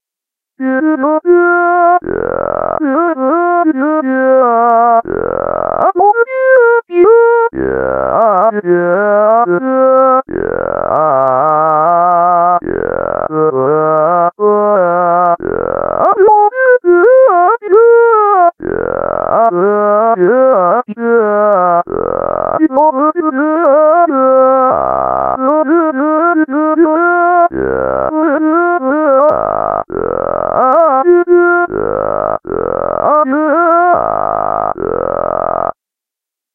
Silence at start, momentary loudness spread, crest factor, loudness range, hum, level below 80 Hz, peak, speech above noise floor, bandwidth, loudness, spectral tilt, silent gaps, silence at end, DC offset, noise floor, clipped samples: 0.6 s; 8 LU; 10 dB; 3 LU; none; -42 dBFS; 0 dBFS; 74 dB; 3.3 kHz; -10 LUFS; -10.5 dB/octave; none; 0.85 s; under 0.1%; -84 dBFS; under 0.1%